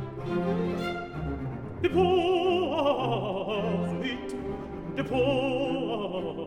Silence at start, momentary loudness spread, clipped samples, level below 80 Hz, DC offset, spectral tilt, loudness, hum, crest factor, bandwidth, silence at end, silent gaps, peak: 0 s; 11 LU; under 0.1%; -50 dBFS; 0.1%; -7 dB/octave; -29 LUFS; none; 16 dB; 10.5 kHz; 0 s; none; -12 dBFS